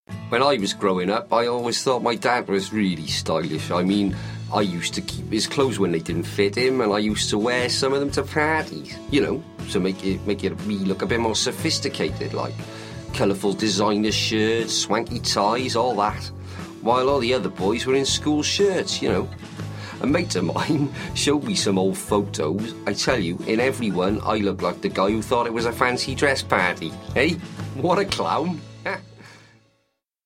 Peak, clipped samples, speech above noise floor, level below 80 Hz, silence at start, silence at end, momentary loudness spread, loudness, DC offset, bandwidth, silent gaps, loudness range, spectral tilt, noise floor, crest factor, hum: 0 dBFS; under 0.1%; 49 dB; -48 dBFS; 0.1 s; 0.9 s; 8 LU; -22 LUFS; under 0.1%; 16.5 kHz; none; 2 LU; -4.5 dB/octave; -72 dBFS; 22 dB; none